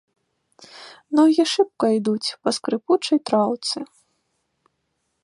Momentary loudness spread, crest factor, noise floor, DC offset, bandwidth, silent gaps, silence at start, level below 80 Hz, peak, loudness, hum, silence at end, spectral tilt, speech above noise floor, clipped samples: 20 LU; 18 dB; -74 dBFS; under 0.1%; 11.5 kHz; none; 0.75 s; -76 dBFS; -4 dBFS; -21 LUFS; none; 1.4 s; -4.5 dB/octave; 54 dB; under 0.1%